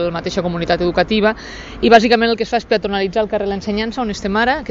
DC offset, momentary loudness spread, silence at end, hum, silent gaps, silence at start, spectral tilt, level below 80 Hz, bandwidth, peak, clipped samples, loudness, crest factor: under 0.1%; 9 LU; 0 s; none; none; 0 s; -5.5 dB/octave; -38 dBFS; 7.8 kHz; 0 dBFS; under 0.1%; -16 LUFS; 16 dB